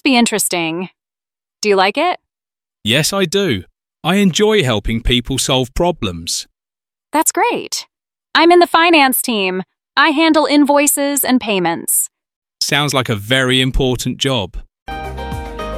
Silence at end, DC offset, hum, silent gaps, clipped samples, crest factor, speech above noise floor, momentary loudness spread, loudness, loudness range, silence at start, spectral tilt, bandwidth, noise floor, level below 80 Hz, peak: 0 s; under 0.1%; none; 12.36-12.42 s, 14.82-14.86 s; under 0.1%; 16 dB; over 76 dB; 14 LU; -14 LUFS; 5 LU; 0.05 s; -3.5 dB/octave; 16 kHz; under -90 dBFS; -34 dBFS; 0 dBFS